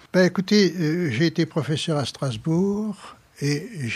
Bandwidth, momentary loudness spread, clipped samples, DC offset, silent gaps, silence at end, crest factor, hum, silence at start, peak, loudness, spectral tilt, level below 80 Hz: 13.5 kHz; 9 LU; under 0.1%; under 0.1%; none; 0 s; 16 dB; none; 0.15 s; -6 dBFS; -23 LUFS; -6 dB/octave; -60 dBFS